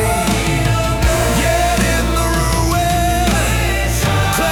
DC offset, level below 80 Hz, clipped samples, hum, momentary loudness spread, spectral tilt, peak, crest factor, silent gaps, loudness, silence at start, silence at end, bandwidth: under 0.1%; -20 dBFS; under 0.1%; none; 2 LU; -4.5 dB/octave; -4 dBFS; 10 dB; none; -15 LUFS; 0 s; 0 s; over 20 kHz